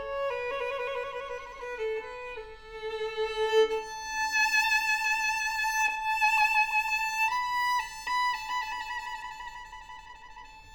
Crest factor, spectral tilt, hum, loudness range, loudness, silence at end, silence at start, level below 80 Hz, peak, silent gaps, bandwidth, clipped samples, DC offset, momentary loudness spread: 18 dB; 0.5 dB/octave; none; 8 LU; -28 LUFS; 0 s; 0 s; -56 dBFS; -14 dBFS; none; over 20 kHz; under 0.1%; under 0.1%; 19 LU